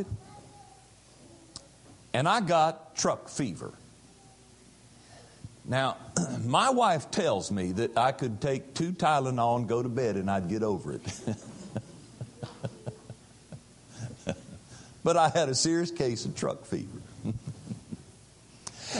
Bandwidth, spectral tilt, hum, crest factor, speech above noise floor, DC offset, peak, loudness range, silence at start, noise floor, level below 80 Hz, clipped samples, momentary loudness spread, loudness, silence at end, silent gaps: 11.5 kHz; -4.5 dB/octave; none; 22 dB; 28 dB; under 0.1%; -8 dBFS; 9 LU; 0 s; -56 dBFS; -58 dBFS; under 0.1%; 23 LU; -29 LUFS; 0 s; none